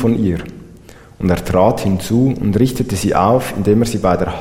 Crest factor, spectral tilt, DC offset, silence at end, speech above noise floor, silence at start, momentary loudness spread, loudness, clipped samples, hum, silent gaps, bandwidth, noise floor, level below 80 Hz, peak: 14 dB; -7 dB/octave; under 0.1%; 0 s; 25 dB; 0 s; 5 LU; -15 LUFS; under 0.1%; none; none; 16.5 kHz; -40 dBFS; -36 dBFS; 0 dBFS